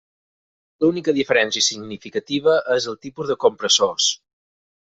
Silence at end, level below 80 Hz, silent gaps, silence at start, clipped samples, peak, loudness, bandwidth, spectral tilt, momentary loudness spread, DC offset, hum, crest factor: 0.8 s; -64 dBFS; none; 0.8 s; under 0.1%; -2 dBFS; -19 LUFS; 8 kHz; -2 dB/octave; 12 LU; under 0.1%; none; 20 dB